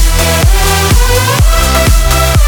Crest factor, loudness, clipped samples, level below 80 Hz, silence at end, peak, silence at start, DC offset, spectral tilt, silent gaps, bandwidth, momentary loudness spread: 8 dB; -9 LUFS; 0.3%; -10 dBFS; 0 s; 0 dBFS; 0 s; under 0.1%; -3.5 dB/octave; none; over 20 kHz; 1 LU